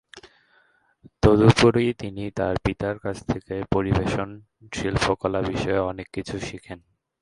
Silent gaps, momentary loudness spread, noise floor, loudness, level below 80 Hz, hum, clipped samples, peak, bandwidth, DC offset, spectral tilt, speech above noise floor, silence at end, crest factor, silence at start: none; 17 LU; -62 dBFS; -23 LUFS; -40 dBFS; none; under 0.1%; 0 dBFS; 11.5 kHz; under 0.1%; -6.5 dB/octave; 39 dB; 0.45 s; 24 dB; 0.15 s